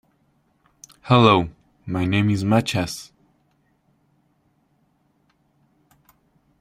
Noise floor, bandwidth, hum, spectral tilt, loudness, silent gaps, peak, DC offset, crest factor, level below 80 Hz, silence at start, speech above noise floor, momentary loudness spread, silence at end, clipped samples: -65 dBFS; 15 kHz; none; -6 dB/octave; -20 LUFS; none; -2 dBFS; under 0.1%; 22 dB; -54 dBFS; 1.05 s; 46 dB; 20 LU; 3.55 s; under 0.1%